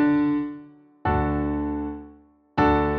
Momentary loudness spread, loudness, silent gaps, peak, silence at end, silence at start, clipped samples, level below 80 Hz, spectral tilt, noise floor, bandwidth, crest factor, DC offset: 13 LU; -25 LUFS; none; -10 dBFS; 0 s; 0 s; under 0.1%; -36 dBFS; -9 dB/octave; -52 dBFS; 5.2 kHz; 14 dB; under 0.1%